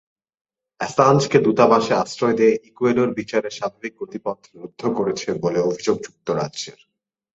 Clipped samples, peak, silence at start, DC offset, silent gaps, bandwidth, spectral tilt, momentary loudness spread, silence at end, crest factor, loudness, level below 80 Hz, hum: under 0.1%; -2 dBFS; 0.8 s; under 0.1%; none; 8 kHz; -5.5 dB/octave; 15 LU; 0.65 s; 20 dB; -20 LUFS; -60 dBFS; none